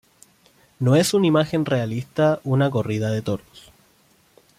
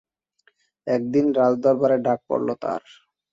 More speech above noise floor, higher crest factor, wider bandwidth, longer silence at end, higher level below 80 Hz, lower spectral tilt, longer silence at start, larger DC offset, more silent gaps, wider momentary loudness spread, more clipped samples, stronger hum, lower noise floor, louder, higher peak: second, 38 dB vs 44 dB; about the same, 16 dB vs 16 dB; first, 16 kHz vs 7.6 kHz; first, 1.2 s vs 0.55 s; first, -58 dBFS vs -66 dBFS; second, -6 dB/octave vs -8 dB/octave; about the same, 0.8 s vs 0.85 s; neither; neither; about the same, 9 LU vs 10 LU; neither; neither; second, -59 dBFS vs -65 dBFS; about the same, -21 LUFS vs -22 LUFS; about the same, -6 dBFS vs -6 dBFS